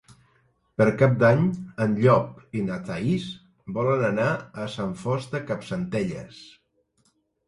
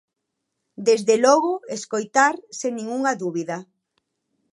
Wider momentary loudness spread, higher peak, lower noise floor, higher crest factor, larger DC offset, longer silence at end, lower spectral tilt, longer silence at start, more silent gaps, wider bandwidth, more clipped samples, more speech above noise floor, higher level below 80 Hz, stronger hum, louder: first, 15 LU vs 12 LU; about the same, -4 dBFS vs -2 dBFS; second, -68 dBFS vs -79 dBFS; about the same, 20 dB vs 20 dB; neither; first, 1.05 s vs 0.9 s; first, -7.5 dB/octave vs -3.5 dB/octave; about the same, 0.8 s vs 0.8 s; neither; about the same, 11 kHz vs 11.5 kHz; neither; second, 45 dB vs 58 dB; first, -56 dBFS vs -80 dBFS; neither; second, -24 LUFS vs -21 LUFS